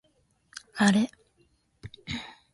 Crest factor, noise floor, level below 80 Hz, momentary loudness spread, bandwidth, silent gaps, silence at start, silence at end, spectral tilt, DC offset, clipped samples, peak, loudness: 22 dB; -69 dBFS; -58 dBFS; 24 LU; 11.5 kHz; none; 0.75 s; 0.25 s; -5 dB/octave; under 0.1%; under 0.1%; -8 dBFS; -27 LUFS